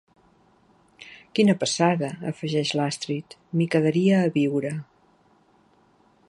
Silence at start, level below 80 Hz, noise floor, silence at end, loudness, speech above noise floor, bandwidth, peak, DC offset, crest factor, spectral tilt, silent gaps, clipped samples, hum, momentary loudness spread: 1 s; -70 dBFS; -60 dBFS; 1.45 s; -24 LUFS; 37 dB; 11.5 kHz; -6 dBFS; under 0.1%; 20 dB; -5.5 dB/octave; none; under 0.1%; none; 12 LU